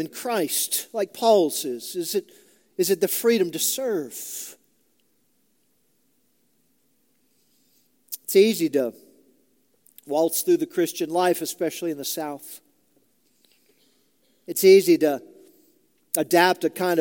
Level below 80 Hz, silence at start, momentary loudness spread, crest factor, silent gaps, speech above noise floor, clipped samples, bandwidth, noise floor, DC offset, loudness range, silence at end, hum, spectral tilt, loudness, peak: -82 dBFS; 0 s; 14 LU; 22 dB; none; 47 dB; under 0.1%; 17 kHz; -69 dBFS; under 0.1%; 8 LU; 0 s; none; -3.5 dB/octave; -22 LUFS; -2 dBFS